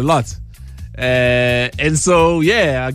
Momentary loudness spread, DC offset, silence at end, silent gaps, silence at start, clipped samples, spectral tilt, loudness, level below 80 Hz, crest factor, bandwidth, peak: 19 LU; under 0.1%; 0 s; none; 0 s; under 0.1%; -4.5 dB/octave; -14 LUFS; -34 dBFS; 14 dB; 15.5 kHz; -2 dBFS